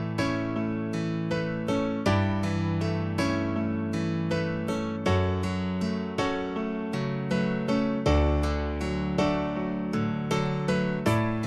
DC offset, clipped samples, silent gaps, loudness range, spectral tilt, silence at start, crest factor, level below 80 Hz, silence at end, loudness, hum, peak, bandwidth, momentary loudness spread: under 0.1%; under 0.1%; none; 1 LU; -7 dB/octave; 0 s; 16 dB; -38 dBFS; 0 s; -28 LUFS; none; -12 dBFS; 13 kHz; 4 LU